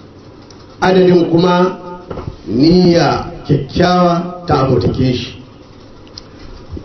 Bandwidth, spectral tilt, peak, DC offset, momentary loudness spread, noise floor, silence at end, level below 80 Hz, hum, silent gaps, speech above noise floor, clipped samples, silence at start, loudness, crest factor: 6.4 kHz; -7.5 dB/octave; 0 dBFS; under 0.1%; 19 LU; -37 dBFS; 0 s; -36 dBFS; none; none; 26 dB; under 0.1%; 0.15 s; -12 LUFS; 14 dB